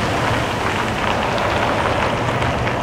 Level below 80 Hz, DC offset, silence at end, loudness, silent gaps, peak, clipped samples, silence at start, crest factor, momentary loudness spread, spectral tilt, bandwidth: -36 dBFS; under 0.1%; 0 s; -19 LUFS; none; -4 dBFS; under 0.1%; 0 s; 16 dB; 2 LU; -5 dB/octave; 16 kHz